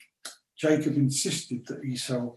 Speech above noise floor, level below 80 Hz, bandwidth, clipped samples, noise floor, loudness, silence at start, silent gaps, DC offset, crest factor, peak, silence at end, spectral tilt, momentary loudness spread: 20 dB; -70 dBFS; 13 kHz; under 0.1%; -48 dBFS; -28 LUFS; 0.25 s; none; under 0.1%; 18 dB; -10 dBFS; 0 s; -4.5 dB/octave; 19 LU